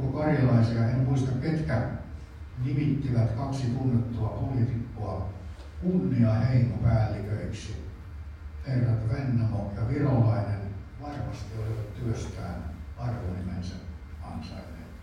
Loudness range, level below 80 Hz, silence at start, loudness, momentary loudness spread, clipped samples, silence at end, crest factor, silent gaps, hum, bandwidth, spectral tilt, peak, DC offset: 7 LU; -44 dBFS; 0 s; -28 LUFS; 17 LU; under 0.1%; 0 s; 16 dB; none; none; 9.2 kHz; -8.5 dB/octave; -12 dBFS; under 0.1%